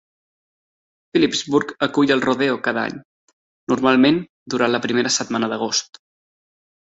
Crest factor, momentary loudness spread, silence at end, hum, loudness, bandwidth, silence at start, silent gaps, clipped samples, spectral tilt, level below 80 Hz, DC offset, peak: 18 dB; 8 LU; 1.1 s; none; -19 LUFS; 8 kHz; 1.15 s; 3.05-3.67 s, 4.30-4.46 s; under 0.1%; -3.5 dB/octave; -60 dBFS; under 0.1%; -2 dBFS